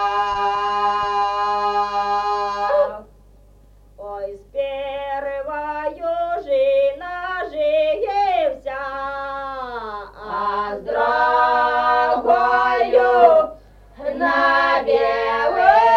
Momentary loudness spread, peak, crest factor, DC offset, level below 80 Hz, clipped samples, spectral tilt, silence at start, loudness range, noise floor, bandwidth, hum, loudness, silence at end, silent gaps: 13 LU; 0 dBFS; 18 dB; under 0.1%; -48 dBFS; under 0.1%; -4 dB/octave; 0 s; 9 LU; -48 dBFS; 7.8 kHz; 50 Hz at -50 dBFS; -19 LUFS; 0 s; none